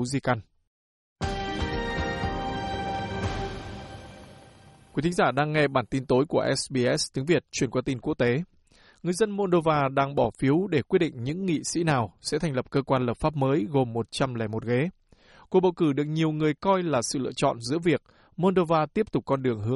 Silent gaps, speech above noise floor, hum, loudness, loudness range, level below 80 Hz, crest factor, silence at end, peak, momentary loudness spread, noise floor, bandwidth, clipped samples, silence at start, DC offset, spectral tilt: 0.67-1.16 s; 30 dB; none; -26 LUFS; 6 LU; -48 dBFS; 16 dB; 0 s; -10 dBFS; 8 LU; -55 dBFS; 11.5 kHz; under 0.1%; 0 s; under 0.1%; -5.5 dB/octave